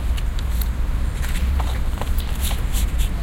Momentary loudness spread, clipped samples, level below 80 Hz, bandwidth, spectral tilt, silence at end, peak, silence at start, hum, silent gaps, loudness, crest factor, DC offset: 2 LU; under 0.1%; -20 dBFS; 17 kHz; -5 dB/octave; 0 s; -6 dBFS; 0 s; none; none; -24 LUFS; 14 dB; under 0.1%